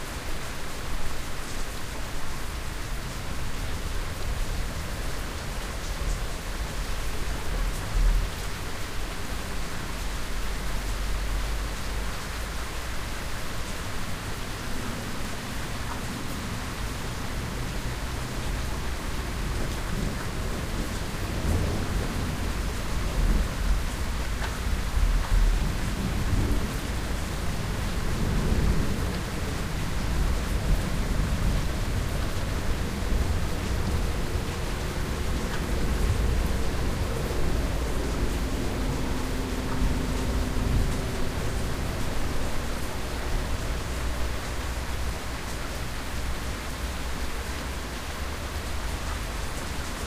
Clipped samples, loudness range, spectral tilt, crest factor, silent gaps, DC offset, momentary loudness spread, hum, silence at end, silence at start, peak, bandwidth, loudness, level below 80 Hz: under 0.1%; 5 LU; -5 dB/octave; 16 dB; none; under 0.1%; 6 LU; none; 0 s; 0 s; -10 dBFS; 15.5 kHz; -31 LUFS; -30 dBFS